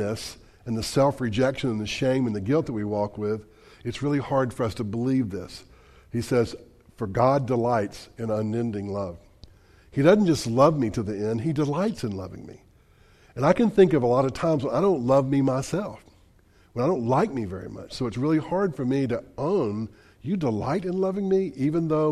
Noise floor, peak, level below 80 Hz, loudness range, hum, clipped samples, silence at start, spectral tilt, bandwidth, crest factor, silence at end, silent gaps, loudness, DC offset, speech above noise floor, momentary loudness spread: -57 dBFS; -4 dBFS; -52 dBFS; 5 LU; none; under 0.1%; 0 s; -7 dB/octave; 14 kHz; 20 dB; 0 s; none; -25 LUFS; under 0.1%; 33 dB; 14 LU